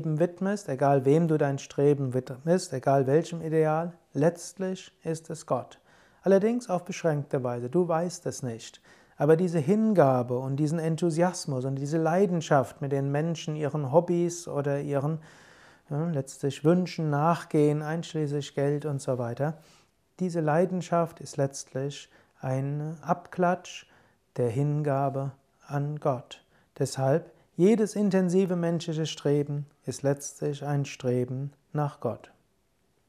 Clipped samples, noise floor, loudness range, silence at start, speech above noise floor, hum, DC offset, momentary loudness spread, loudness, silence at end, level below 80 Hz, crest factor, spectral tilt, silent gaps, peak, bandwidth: under 0.1%; -71 dBFS; 5 LU; 0 s; 44 dB; none; under 0.1%; 11 LU; -28 LUFS; 0.9 s; -72 dBFS; 20 dB; -7 dB/octave; none; -6 dBFS; 13.5 kHz